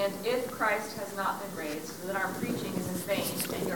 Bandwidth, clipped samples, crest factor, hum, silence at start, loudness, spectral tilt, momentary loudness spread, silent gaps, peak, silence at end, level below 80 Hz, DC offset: 18 kHz; under 0.1%; 16 dB; none; 0 s; -32 LUFS; -4 dB/octave; 7 LU; none; -16 dBFS; 0 s; -64 dBFS; 0.2%